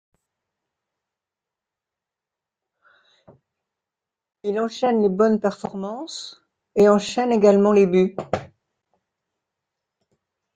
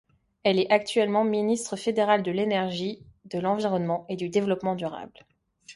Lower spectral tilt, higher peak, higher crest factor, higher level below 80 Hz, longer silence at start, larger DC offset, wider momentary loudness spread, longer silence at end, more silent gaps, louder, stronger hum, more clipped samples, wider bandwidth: first, -6.5 dB/octave vs -5 dB/octave; about the same, -4 dBFS vs -6 dBFS; about the same, 20 dB vs 20 dB; about the same, -64 dBFS vs -66 dBFS; first, 4.45 s vs 0.45 s; neither; first, 16 LU vs 12 LU; first, 2.1 s vs 0 s; neither; first, -20 LUFS vs -26 LUFS; neither; neither; second, 9.2 kHz vs 11.5 kHz